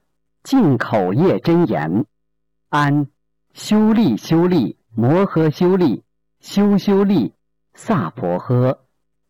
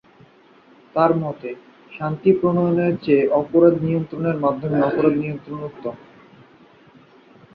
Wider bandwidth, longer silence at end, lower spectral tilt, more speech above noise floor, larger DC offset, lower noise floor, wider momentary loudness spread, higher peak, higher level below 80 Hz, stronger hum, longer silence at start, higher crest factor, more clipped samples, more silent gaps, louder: first, 17 kHz vs 5.2 kHz; second, 0.55 s vs 1.6 s; second, -7.5 dB/octave vs -11 dB/octave; first, 61 dB vs 32 dB; neither; first, -76 dBFS vs -51 dBFS; second, 9 LU vs 16 LU; second, -10 dBFS vs -2 dBFS; about the same, -54 dBFS vs -58 dBFS; neither; second, 0.45 s vs 0.95 s; second, 8 dB vs 18 dB; neither; neither; first, -17 LUFS vs -20 LUFS